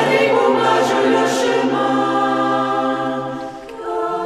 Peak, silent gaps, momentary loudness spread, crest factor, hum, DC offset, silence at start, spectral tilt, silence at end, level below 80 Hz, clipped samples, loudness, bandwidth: -2 dBFS; none; 11 LU; 14 dB; none; under 0.1%; 0 s; -4.5 dB/octave; 0 s; -58 dBFS; under 0.1%; -17 LUFS; 14 kHz